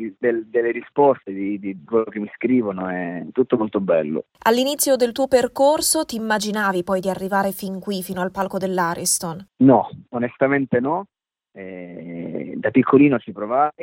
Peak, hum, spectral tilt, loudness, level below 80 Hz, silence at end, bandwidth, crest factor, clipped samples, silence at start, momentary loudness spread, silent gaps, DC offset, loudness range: -2 dBFS; none; -4.5 dB/octave; -20 LUFS; -60 dBFS; 0 s; 16 kHz; 18 dB; under 0.1%; 0 s; 13 LU; none; under 0.1%; 3 LU